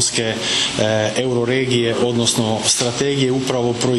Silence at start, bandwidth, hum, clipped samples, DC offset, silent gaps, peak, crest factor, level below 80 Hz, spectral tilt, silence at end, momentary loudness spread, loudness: 0 s; 12.5 kHz; none; under 0.1%; 0.1%; none; -4 dBFS; 14 dB; -50 dBFS; -3.5 dB/octave; 0 s; 3 LU; -17 LUFS